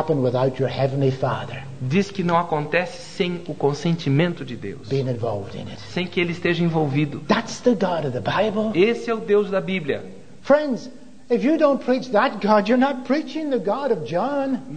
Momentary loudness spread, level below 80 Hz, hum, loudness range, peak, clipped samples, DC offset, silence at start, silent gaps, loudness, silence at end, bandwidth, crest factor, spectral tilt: 10 LU; -56 dBFS; none; 3 LU; -2 dBFS; under 0.1%; 0.9%; 0 s; none; -22 LUFS; 0 s; 9.4 kHz; 20 dB; -7 dB/octave